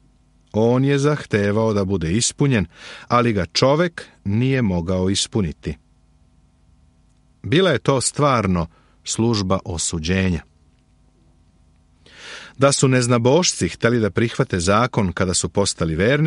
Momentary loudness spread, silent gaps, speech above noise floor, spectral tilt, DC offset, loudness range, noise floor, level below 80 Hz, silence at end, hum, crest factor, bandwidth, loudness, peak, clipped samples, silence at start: 12 LU; none; 38 dB; -5 dB/octave; under 0.1%; 6 LU; -56 dBFS; -44 dBFS; 0 s; none; 18 dB; 11.5 kHz; -19 LUFS; -2 dBFS; under 0.1%; 0.55 s